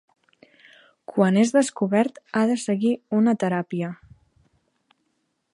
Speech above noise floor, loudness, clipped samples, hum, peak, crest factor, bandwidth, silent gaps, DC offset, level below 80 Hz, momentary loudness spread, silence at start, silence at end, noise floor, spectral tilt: 52 dB; -22 LUFS; under 0.1%; none; -4 dBFS; 20 dB; 11.5 kHz; none; under 0.1%; -68 dBFS; 11 LU; 1.1 s; 1.6 s; -73 dBFS; -6 dB/octave